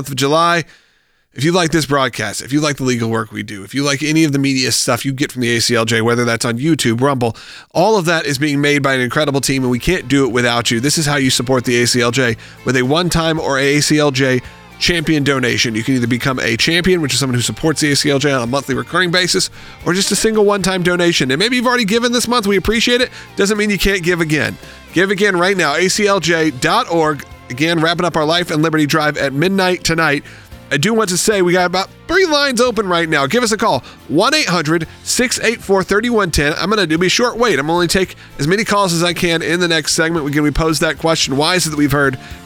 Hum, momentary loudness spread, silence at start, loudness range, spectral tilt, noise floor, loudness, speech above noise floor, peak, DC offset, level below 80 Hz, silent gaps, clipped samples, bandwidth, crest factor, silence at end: none; 5 LU; 0 s; 1 LU; -4 dB/octave; -57 dBFS; -14 LUFS; 42 dB; 0 dBFS; under 0.1%; -38 dBFS; none; under 0.1%; 19.5 kHz; 14 dB; 0 s